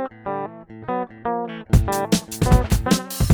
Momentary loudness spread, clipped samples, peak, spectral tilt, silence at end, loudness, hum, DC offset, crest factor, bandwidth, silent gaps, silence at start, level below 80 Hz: 10 LU; under 0.1%; -4 dBFS; -5.5 dB/octave; 0 s; -22 LUFS; none; under 0.1%; 18 dB; over 20 kHz; none; 0 s; -26 dBFS